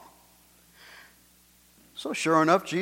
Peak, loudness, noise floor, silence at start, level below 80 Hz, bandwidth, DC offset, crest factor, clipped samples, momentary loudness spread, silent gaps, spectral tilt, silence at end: -6 dBFS; -25 LUFS; -60 dBFS; 1.95 s; -70 dBFS; 16.5 kHz; under 0.1%; 22 dB; under 0.1%; 27 LU; none; -4.5 dB/octave; 0 s